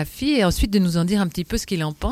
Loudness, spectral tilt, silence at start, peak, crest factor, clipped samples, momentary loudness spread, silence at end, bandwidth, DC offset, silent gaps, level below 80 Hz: -21 LUFS; -5.5 dB/octave; 0 s; -6 dBFS; 14 dB; under 0.1%; 6 LU; 0 s; 16 kHz; under 0.1%; none; -32 dBFS